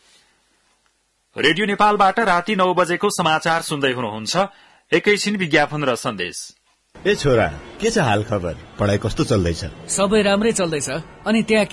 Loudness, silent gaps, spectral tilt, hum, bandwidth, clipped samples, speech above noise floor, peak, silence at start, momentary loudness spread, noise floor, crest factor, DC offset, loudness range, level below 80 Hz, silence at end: -19 LUFS; none; -4.5 dB/octave; none; 12 kHz; under 0.1%; 46 dB; -4 dBFS; 1.35 s; 9 LU; -65 dBFS; 16 dB; under 0.1%; 3 LU; -44 dBFS; 0 s